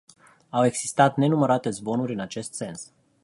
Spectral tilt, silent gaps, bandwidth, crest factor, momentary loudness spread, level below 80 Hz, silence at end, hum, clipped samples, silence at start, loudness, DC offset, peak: -5.5 dB/octave; none; 11.5 kHz; 22 dB; 14 LU; -66 dBFS; 0.4 s; none; under 0.1%; 0.55 s; -24 LUFS; under 0.1%; -4 dBFS